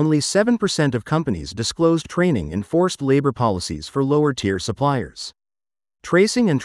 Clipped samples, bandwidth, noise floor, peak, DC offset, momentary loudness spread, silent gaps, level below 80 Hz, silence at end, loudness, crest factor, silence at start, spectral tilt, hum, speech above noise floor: under 0.1%; 12 kHz; under -90 dBFS; -4 dBFS; under 0.1%; 8 LU; none; -48 dBFS; 0 s; -20 LUFS; 16 dB; 0 s; -5.5 dB/octave; none; over 71 dB